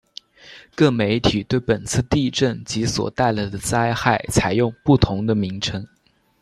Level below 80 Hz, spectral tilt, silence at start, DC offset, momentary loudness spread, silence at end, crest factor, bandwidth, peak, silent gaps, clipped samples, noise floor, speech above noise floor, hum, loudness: -40 dBFS; -5 dB/octave; 0.45 s; under 0.1%; 8 LU; 0.55 s; 18 dB; 13.5 kHz; -2 dBFS; none; under 0.1%; -43 dBFS; 23 dB; none; -20 LUFS